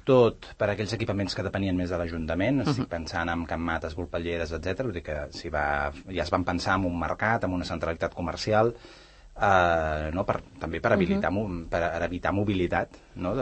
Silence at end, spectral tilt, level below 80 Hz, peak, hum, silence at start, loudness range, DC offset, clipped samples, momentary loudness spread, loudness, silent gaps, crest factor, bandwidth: 0 s; -6.5 dB/octave; -44 dBFS; -6 dBFS; none; 0.05 s; 4 LU; under 0.1%; under 0.1%; 8 LU; -28 LUFS; none; 20 dB; 8.8 kHz